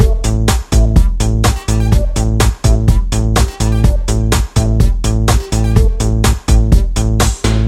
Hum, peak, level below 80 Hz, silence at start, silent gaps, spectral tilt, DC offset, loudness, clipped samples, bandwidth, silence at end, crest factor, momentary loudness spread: none; 0 dBFS; -14 dBFS; 0 s; none; -5.5 dB/octave; under 0.1%; -13 LUFS; under 0.1%; 15 kHz; 0 s; 10 dB; 3 LU